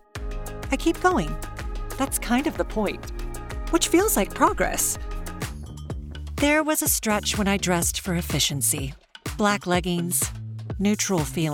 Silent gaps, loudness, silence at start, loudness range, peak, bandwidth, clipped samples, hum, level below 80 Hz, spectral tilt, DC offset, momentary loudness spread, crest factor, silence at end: none; -23 LUFS; 0.15 s; 3 LU; -6 dBFS; 18 kHz; under 0.1%; none; -36 dBFS; -3.5 dB/octave; under 0.1%; 15 LU; 18 dB; 0 s